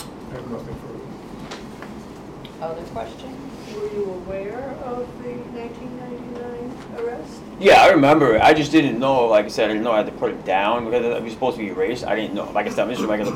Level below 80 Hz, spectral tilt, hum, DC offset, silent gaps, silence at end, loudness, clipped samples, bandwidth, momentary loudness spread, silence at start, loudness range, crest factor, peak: -48 dBFS; -5.5 dB/octave; none; under 0.1%; none; 0 s; -19 LUFS; under 0.1%; 16 kHz; 21 LU; 0 s; 17 LU; 16 dB; -6 dBFS